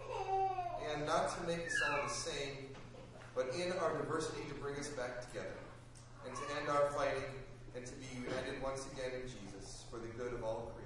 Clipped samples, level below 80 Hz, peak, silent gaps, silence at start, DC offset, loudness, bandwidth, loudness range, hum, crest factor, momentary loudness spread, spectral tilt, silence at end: under 0.1%; -58 dBFS; -22 dBFS; none; 0 s; under 0.1%; -40 LUFS; 11.5 kHz; 5 LU; none; 18 dB; 15 LU; -4 dB/octave; 0 s